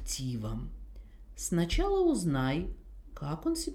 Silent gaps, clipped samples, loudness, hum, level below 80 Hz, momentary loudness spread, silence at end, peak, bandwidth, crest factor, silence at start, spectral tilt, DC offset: none; under 0.1%; -32 LUFS; none; -40 dBFS; 22 LU; 0 s; -16 dBFS; 17 kHz; 16 dB; 0 s; -5.5 dB/octave; under 0.1%